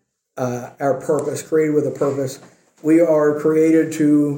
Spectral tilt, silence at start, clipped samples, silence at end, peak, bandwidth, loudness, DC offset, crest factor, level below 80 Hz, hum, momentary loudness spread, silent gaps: -7 dB/octave; 0.35 s; under 0.1%; 0 s; -4 dBFS; 17 kHz; -18 LUFS; under 0.1%; 14 dB; -66 dBFS; none; 11 LU; none